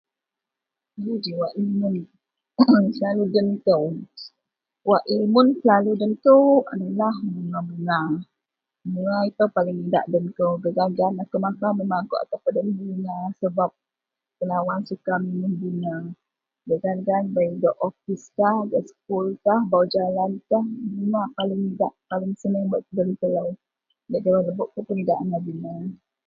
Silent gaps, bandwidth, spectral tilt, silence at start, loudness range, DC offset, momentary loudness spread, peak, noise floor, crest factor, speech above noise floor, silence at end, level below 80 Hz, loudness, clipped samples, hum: none; 7.4 kHz; -8.5 dB/octave; 0.95 s; 7 LU; under 0.1%; 11 LU; -2 dBFS; -86 dBFS; 20 dB; 64 dB; 0.3 s; -68 dBFS; -23 LUFS; under 0.1%; none